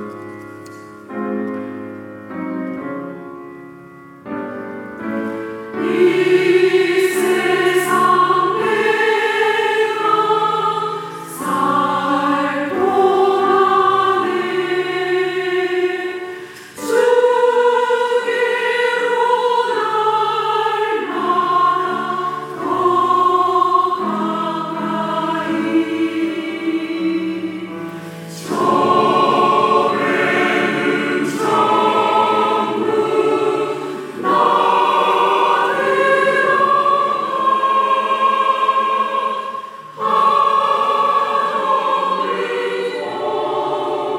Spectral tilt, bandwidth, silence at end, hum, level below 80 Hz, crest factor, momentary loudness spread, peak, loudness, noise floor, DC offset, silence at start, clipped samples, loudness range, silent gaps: -4.5 dB/octave; 16.5 kHz; 0 s; none; -70 dBFS; 16 dB; 14 LU; -2 dBFS; -16 LUFS; -39 dBFS; under 0.1%; 0 s; under 0.1%; 6 LU; none